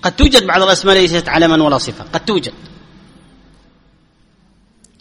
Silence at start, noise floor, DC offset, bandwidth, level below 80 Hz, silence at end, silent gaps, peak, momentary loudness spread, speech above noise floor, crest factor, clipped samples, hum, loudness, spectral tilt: 0.05 s; -52 dBFS; under 0.1%; over 20 kHz; -26 dBFS; 2.35 s; none; 0 dBFS; 11 LU; 40 dB; 16 dB; 0.2%; none; -12 LUFS; -4 dB/octave